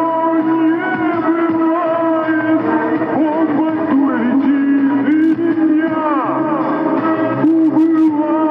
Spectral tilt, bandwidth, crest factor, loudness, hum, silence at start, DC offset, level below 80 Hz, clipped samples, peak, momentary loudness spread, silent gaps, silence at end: -9 dB/octave; 3.8 kHz; 10 dB; -15 LUFS; none; 0 s; under 0.1%; -62 dBFS; under 0.1%; -4 dBFS; 4 LU; none; 0 s